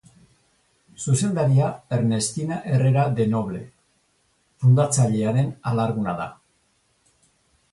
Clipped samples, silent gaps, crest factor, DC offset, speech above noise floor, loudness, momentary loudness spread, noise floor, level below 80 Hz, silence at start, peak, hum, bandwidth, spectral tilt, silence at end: under 0.1%; none; 16 dB; under 0.1%; 45 dB; -22 LUFS; 10 LU; -66 dBFS; -58 dBFS; 1 s; -8 dBFS; none; 11.5 kHz; -6.5 dB/octave; 1.4 s